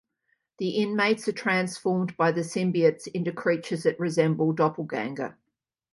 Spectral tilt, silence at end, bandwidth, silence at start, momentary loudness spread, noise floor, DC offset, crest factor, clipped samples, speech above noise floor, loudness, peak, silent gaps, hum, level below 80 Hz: -6 dB/octave; 0.6 s; 11.5 kHz; 0.6 s; 8 LU; -83 dBFS; under 0.1%; 18 dB; under 0.1%; 57 dB; -26 LUFS; -8 dBFS; none; none; -72 dBFS